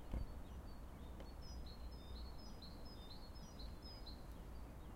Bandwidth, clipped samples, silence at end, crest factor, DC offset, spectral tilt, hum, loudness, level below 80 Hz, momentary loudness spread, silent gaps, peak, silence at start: 16 kHz; under 0.1%; 0 s; 22 dB; under 0.1%; -5.5 dB/octave; none; -55 LUFS; -54 dBFS; 2 LU; none; -30 dBFS; 0 s